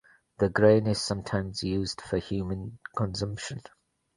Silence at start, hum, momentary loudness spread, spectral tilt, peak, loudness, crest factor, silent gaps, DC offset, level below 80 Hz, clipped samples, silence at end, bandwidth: 0.4 s; none; 15 LU; -5.5 dB/octave; -8 dBFS; -28 LUFS; 22 dB; none; under 0.1%; -50 dBFS; under 0.1%; 0.55 s; 11.5 kHz